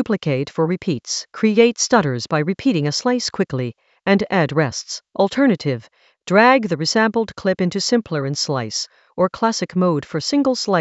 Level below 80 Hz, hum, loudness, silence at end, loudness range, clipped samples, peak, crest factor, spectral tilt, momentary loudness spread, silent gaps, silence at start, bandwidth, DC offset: -58 dBFS; none; -19 LUFS; 0 s; 2 LU; under 0.1%; 0 dBFS; 18 dB; -4.5 dB/octave; 10 LU; none; 0 s; 8.2 kHz; under 0.1%